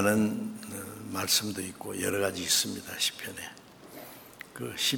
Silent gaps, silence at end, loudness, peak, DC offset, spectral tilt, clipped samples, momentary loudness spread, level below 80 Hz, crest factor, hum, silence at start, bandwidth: none; 0 s; -30 LUFS; -10 dBFS; under 0.1%; -2.5 dB/octave; under 0.1%; 20 LU; -68 dBFS; 22 dB; none; 0 s; 19.5 kHz